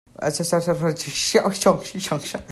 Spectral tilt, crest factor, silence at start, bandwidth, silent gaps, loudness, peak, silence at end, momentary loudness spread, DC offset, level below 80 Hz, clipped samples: -4 dB/octave; 18 dB; 0.2 s; 15.5 kHz; none; -22 LUFS; -4 dBFS; 0 s; 7 LU; under 0.1%; -54 dBFS; under 0.1%